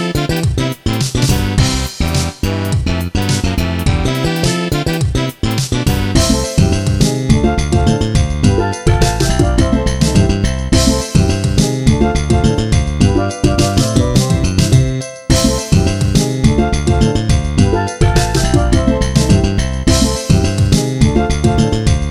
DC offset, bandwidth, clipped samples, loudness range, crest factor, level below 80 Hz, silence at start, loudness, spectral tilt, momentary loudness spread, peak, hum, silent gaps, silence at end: under 0.1%; 17 kHz; under 0.1%; 3 LU; 12 dB; -20 dBFS; 0 s; -14 LUFS; -5.5 dB/octave; 4 LU; 0 dBFS; none; none; 0 s